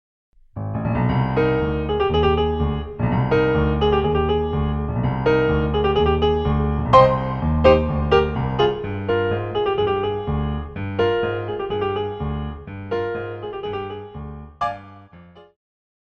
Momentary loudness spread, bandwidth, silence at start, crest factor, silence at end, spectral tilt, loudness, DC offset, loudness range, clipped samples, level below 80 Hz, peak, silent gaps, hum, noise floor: 11 LU; 6.6 kHz; 0.55 s; 20 dB; 0.6 s; -8.5 dB/octave; -21 LUFS; under 0.1%; 10 LU; under 0.1%; -30 dBFS; 0 dBFS; none; none; -46 dBFS